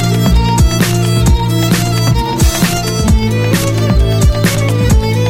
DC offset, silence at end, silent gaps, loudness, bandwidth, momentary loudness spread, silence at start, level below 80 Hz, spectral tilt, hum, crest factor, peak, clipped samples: under 0.1%; 0 s; none; -12 LUFS; 17 kHz; 2 LU; 0 s; -16 dBFS; -5.5 dB/octave; none; 10 dB; 0 dBFS; under 0.1%